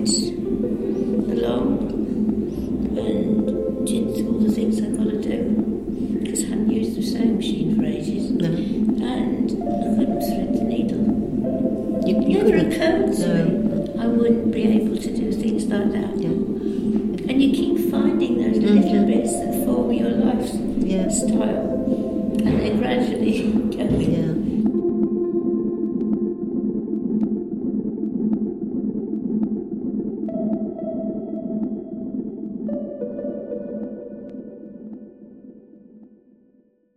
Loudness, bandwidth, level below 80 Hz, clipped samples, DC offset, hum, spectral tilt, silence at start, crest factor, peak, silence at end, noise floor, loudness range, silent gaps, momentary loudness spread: -22 LUFS; 14.5 kHz; -42 dBFS; under 0.1%; under 0.1%; none; -6.5 dB/octave; 0 s; 18 dB; -4 dBFS; 0.95 s; -59 dBFS; 9 LU; none; 9 LU